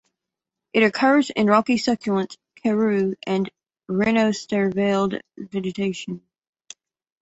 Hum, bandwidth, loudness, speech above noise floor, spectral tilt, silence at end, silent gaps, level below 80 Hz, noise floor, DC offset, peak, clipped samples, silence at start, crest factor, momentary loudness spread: none; 8.2 kHz; -22 LUFS; 65 dB; -5.5 dB/octave; 1.05 s; none; -62 dBFS; -85 dBFS; under 0.1%; -4 dBFS; under 0.1%; 0.75 s; 20 dB; 13 LU